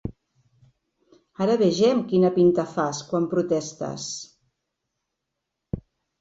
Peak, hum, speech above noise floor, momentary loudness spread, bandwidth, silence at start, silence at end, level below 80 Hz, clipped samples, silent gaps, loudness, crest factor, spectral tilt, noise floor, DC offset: -8 dBFS; none; 60 dB; 17 LU; 8 kHz; 0.05 s; 0.4 s; -54 dBFS; under 0.1%; none; -23 LUFS; 18 dB; -6 dB/octave; -82 dBFS; under 0.1%